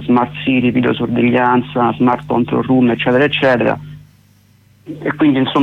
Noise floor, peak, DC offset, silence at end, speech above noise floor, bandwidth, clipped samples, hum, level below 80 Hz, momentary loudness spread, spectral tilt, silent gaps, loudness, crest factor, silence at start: -50 dBFS; -2 dBFS; under 0.1%; 0 s; 36 dB; 5.4 kHz; under 0.1%; 50 Hz at -35 dBFS; -48 dBFS; 5 LU; -8 dB/octave; none; -14 LUFS; 12 dB; 0 s